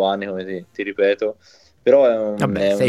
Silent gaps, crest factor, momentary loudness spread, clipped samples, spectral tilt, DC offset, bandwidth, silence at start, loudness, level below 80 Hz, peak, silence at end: none; 16 dB; 13 LU; under 0.1%; -6 dB/octave; under 0.1%; 12.5 kHz; 0 s; -19 LUFS; -56 dBFS; -2 dBFS; 0 s